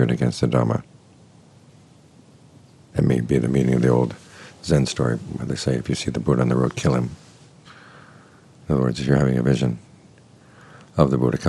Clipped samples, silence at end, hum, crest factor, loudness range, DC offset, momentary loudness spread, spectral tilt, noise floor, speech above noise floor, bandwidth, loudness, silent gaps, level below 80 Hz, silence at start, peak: under 0.1%; 0 s; none; 22 dB; 3 LU; under 0.1%; 10 LU; -7 dB/octave; -50 dBFS; 30 dB; 11.5 kHz; -21 LUFS; none; -44 dBFS; 0 s; 0 dBFS